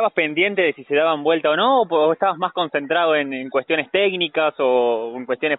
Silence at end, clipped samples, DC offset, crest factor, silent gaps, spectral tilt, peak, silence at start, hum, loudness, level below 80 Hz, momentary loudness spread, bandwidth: 0 s; under 0.1%; under 0.1%; 14 dB; none; -1.5 dB/octave; -4 dBFS; 0 s; none; -19 LUFS; -68 dBFS; 6 LU; 4.1 kHz